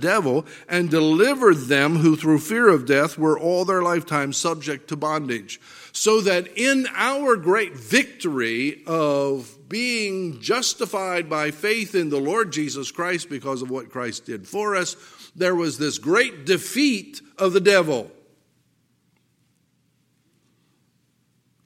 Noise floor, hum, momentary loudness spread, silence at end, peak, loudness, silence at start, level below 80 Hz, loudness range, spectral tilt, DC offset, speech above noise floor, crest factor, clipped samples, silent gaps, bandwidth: -66 dBFS; none; 12 LU; 3.6 s; 0 dBFS; -21 LUFS; 0 s; -74 dBFS; 7 LU; -4 dB/octave; under 0.1%; 45 dB; 22 dB; under 0.1%; none; 16.5 kHz